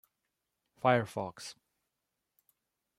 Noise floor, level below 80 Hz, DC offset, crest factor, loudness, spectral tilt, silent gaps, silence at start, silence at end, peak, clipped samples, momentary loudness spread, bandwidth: -86 dBFS; -78 dBFS; under 0.1%; 26 dB; -32 LUFS; -5.5 dB/octave; none; 0.85 s; 1.45 s; -12 dBFS; under 0.1%; 18 LU; 16 kHz